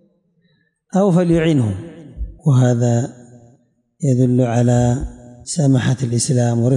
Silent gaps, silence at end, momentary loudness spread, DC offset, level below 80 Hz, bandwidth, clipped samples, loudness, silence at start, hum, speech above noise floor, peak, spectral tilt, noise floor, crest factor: none; 0 s; 15 LU; under 0.1%; -38 dBFS; 11.5 kHz; under 0.1%; -16 LUFS; 0.95 s; none; 47 dB; -6 dBFS; -7 dB/octave; -62 dBFS; 12 dB